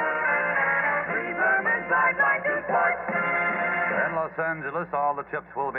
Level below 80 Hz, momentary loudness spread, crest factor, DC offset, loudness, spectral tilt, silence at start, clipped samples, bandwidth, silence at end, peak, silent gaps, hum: -62 dBFS; 7 LU; 14 dB; under 0.1%; -24 LUFS; -9 dB/octave; 0 s; under 0.1%; 4 kHz; 0 s; -12 dBFS; none; none